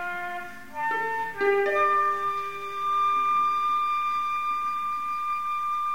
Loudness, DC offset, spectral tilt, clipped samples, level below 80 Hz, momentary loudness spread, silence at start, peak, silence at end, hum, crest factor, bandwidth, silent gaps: -26 LUFS; 0.7%; -3.5 dB/octave; under 0.1%; -64 dBFS; 9 LU; 0 s; -12 dBFS; 0 s; none; 16 dB; 16 kHz; none